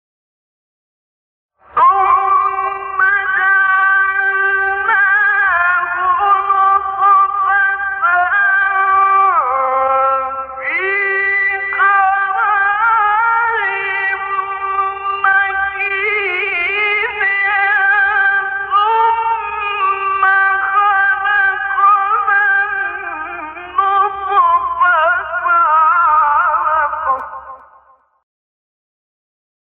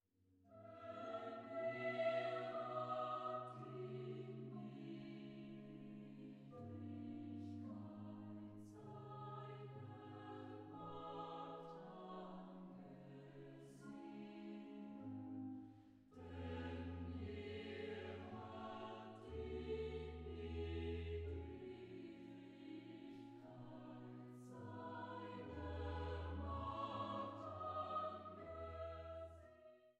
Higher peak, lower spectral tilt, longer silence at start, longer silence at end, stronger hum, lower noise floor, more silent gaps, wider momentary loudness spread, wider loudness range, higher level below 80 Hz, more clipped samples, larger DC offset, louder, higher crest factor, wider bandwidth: first, -2 dBFS vs -32 dBFS; second, -6 dB/octave vs -8 dB/octave; first, 1.75 s vs 0.3 s; first, 2.2 s vs 0.05 s; neither; second, -49 dBFS vs -75 dBFS; neither; second, 7 LU vs 12 LU; second, 3 LU vs 9 LU; first, -52 dBFS vs -64 dBFS; neither; neither; first, -13 LUFS vs -51 LUFS; second, 12 dB vs 18 dB; second, 4.7 kHz vs 9.8 kHz